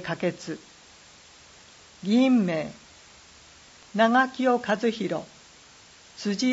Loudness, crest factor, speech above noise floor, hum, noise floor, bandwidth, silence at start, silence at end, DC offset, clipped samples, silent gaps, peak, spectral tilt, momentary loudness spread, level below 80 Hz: -25 LUFS; 18 dB; 28 dB; none; -52 dBFS; 8 kHz; 0 s; 0 s; under 0.1%; under 0.1%; none; -8 dBFS; -5 dB/octave; 18 LU; -66 dBFS